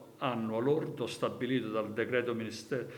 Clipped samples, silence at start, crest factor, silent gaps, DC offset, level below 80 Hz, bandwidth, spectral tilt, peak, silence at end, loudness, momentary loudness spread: under 0.1%; 0 s; 18 dB; none; under 0.1%; -78 dBFS; 20 kHz; -6 dB/octave; -16 dBFS; 0 s; -34 LUFS; 6 LU